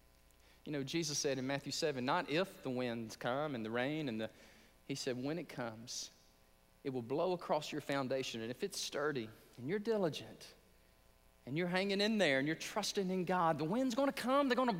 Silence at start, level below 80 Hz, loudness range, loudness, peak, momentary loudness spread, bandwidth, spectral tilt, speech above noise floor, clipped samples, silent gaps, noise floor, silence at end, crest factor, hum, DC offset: 0.65 s; -72 dBFS; 6 LU; -38 LUFS; -20 dBFS; 11 LU; 16 kHz; -4.5 dB/octave; 30 dB; under 0.1%; none; -68 dBFS; 0 s; 18 dB; none; under 0.1%